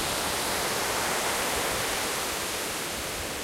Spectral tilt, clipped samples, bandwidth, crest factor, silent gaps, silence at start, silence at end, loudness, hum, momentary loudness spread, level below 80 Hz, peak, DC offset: -1.5 dB/octave; under 0.1%; 16 kHz; 14 dB; none; 0 s; 0 s; -27 LUFS; none; 4 LU; -50 dBFS; -14 dBFS; under 0.1%